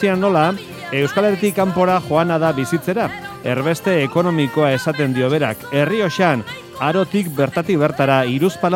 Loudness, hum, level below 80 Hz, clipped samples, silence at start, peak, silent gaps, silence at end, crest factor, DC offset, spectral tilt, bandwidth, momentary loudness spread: -18 LUFS; none; -56 dBFS; under 0.1%; 0 s; 0 dBFS; none; 0 s; 16 dB; under 0.1%; -6 dB/octave; 17 kHz; 6 LU